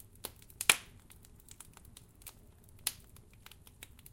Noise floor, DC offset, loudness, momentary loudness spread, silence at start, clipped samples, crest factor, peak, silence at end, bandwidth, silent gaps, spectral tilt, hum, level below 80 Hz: -58 dBFS; under 0.1%; -33 LUFS; 28 LU; 0.25 s; under 0.1%; 36 dB; -4 dBFS; 0.3 s; 17 kHz; none; 0.5 dB/octave; none; -62 dBFS